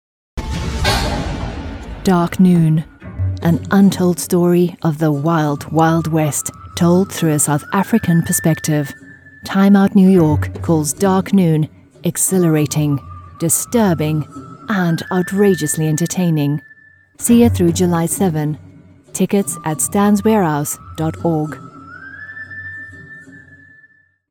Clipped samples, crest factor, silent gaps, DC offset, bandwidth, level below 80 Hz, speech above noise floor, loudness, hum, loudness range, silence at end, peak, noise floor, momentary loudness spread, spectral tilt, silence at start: under 0.1%; 16 dB; none; under 0.1%; 18 kHz; -36 dBFS; 38 dB; -16 LUFS; none; 4 LU; 0.95 s; 0 dBFS; -52 dBFS; 17 LU; -5.5 dB/octave; 0.35 s